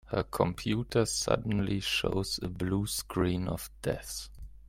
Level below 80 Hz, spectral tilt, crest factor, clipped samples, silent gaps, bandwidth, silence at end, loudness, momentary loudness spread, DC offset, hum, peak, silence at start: -48 dBFS; -4.5 dB/octave; 22 dB; under 0.1%; none; 16.5 kHz; 0.1 s; -32 LUFS; 7 LU; under 0.1%; none; -10 dBFS; 0.05 s